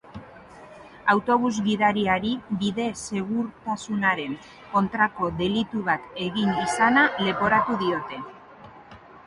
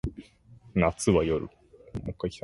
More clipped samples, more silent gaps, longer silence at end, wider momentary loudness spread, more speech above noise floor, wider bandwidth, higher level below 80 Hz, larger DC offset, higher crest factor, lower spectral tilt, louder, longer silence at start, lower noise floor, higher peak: neither; neither; about the same, 0.05 s vs 0.05 s; second, 10 LU vs 16 LU; second, 23 dB vs 28 dB; about the same, 11.5 kHz vs 11.5 kHz; second, -56 dBFS vs -44 dBFS; neither; about the same, 20 dB vs 20 dB; about the same, -5 dB/octave vs -6 dB/octave; first, -24 LUFS vs -28 LUFS; about the same, 0.05 s vs 0.05 s; second, -47 dBFS vs -54 dBFS; first, -6 dBFS vs -10 dBFS